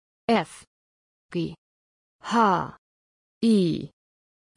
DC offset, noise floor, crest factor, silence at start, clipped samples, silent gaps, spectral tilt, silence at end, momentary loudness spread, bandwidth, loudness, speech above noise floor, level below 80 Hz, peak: under 0.1%; under -90 dBFS; 18 dB; 0.3 s; under 0.1%; 0.67-1.29 s, 1.58-2.19 s, 2.78-3.41 s; -6.5 dB/octave; 0.7 s; 16 LU; 11 kHz; -25 LUFS; over 67 dB; -64 dBFS; -8 dBFS